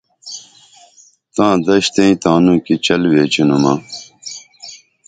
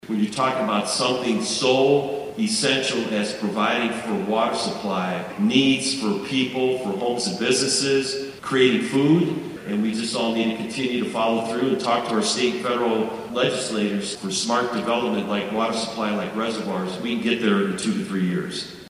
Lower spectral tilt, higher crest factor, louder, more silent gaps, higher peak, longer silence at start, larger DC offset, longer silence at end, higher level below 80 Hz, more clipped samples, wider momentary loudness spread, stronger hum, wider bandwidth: about the same, -5 dB/octave vs -4 dB/octave; about the same, 16 dB vs 18 dB; first, -13 LUFS vs -22 LUFS; neither; first, 0 dBFS vs -4 dBFS; first, 0.25 s vs 0.05 s; neither; first, 0.3 s vs 0 s; first, -50 dBFS vs -62 dBFS; neither; first, 19 LU vs 7 LU; neither; second, 9.4 kHz vs 15 kHz